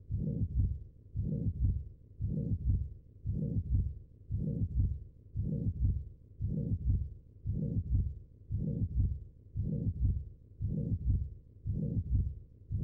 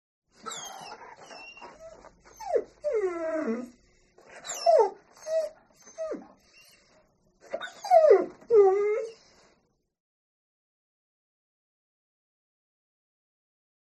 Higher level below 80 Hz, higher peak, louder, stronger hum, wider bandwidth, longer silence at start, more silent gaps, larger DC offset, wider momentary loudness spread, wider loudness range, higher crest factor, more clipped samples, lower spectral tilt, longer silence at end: first, -38 dBFS vs -72 dBFS; second, -20 dBFS vs -8 dBFS; second, -37 LUFS vs -26 LUFS; neither; second, 0.9 kHz vs 13 kHz; second, 0 s vs 0.45 s; neither; neither; second, 11 LU vs 24 LU; second, 1 LU vs 9 LU; second, 14 dB vs 22 dB; neither; first, -14 dB/octave vs -3.5 dB/octave; second, 0 s vs 4.7 s